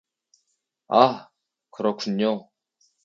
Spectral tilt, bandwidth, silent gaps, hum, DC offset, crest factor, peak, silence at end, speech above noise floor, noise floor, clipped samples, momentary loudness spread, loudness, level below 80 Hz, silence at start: -6 dB/octave; 7.4 kHz; none; none; under 0.1%; 26 dB; 0 dBFS; 0.65 s; 54 dB; -75 dBFS; under 0.1%; 12 LU; -23 LUFS; -76 dBFS; 0.9 s